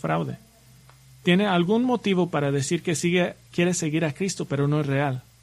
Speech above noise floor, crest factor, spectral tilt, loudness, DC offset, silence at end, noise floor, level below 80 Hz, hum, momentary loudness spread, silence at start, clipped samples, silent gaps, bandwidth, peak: 29 dB; 18 dB; -5.5 dB/octave; -24 LUFS; under 0.1%; 0.2 s; -52 dBFS; -60 dBFS; none; 7 LU; 0.05 s; under 0.1%; none; 14 kHz; -8 dBFS